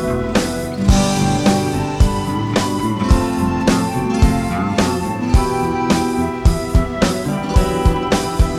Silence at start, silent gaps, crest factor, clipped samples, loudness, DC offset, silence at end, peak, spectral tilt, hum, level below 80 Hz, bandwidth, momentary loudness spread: 0 s; none; 16 dB; under 0.1%; -17 LUFS; under 0.1%; 0 s; 0 dBFS; -5.5 dB/octave; none; -22 dBFS; 15.5 kHz; 3 LU